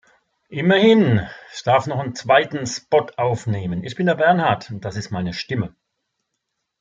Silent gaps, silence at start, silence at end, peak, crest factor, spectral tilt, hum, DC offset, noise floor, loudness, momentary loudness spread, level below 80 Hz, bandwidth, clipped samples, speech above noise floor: none; 0.5 s; 1.15 s; -2 dBFS; 18 dB; -6 dB/octave; none; under 0.1%; -77 dBFS; -19 LUFS; 13 LU; -56 dBFS; 8.8 kHz; under 0.1%; 58 dB